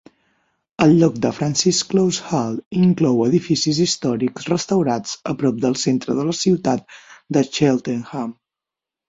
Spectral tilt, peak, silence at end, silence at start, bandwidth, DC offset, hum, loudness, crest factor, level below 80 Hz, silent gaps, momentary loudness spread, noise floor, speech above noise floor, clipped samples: -5 dB/octave; -2 dBFS; 0.75 s; 0.8 s; 8 kHz; under 0.1%; none; -19 LUFS; 18 dB; -56 dBFS; 2.66-2.71 s; 8 LU; -87 dBFS; 69 dB; under 0.1%